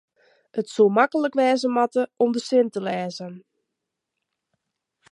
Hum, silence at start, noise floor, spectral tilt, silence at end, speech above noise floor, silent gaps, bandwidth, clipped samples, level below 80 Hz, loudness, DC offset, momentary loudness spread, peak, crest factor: none; 0.55 s; -82 dBFS; -5.5 dB/octave; 1.7 s; 61 dB; none; 11.5 kHz; under 0.1%; -78 dBFS; -22 LUFS; under 0.1%; 13 LU; -4 dBFS; 20 dB